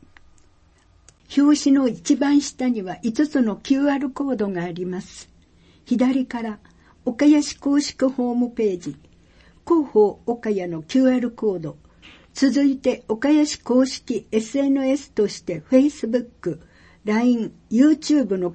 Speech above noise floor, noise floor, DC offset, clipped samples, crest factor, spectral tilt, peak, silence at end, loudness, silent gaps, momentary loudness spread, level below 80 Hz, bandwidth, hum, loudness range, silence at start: 36 dB; -56 dBFS; under 0.1%; under 0.1%; 16 dB; -5 dB/octave; -4 dBFS; 0 s; -21 LUFS; none; 13 LU; -56 dBFS; 8.8 kHz; none; 3 LU; 1.3 s